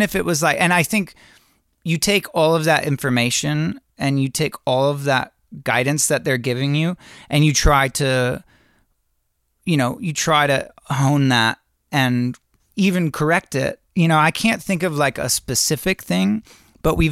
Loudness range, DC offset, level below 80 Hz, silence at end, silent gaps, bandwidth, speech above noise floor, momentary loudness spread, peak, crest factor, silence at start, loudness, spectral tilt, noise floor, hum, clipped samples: 2 LU; under 0.1%; -36 dBFS; 0 s; none; 16 kHz; 50 dB; 9 LU; -4 dBFS; 16 dB; 0 s; -19 LUFS; -4.5 dB/octave; -69 dBFS; none; under 0.1%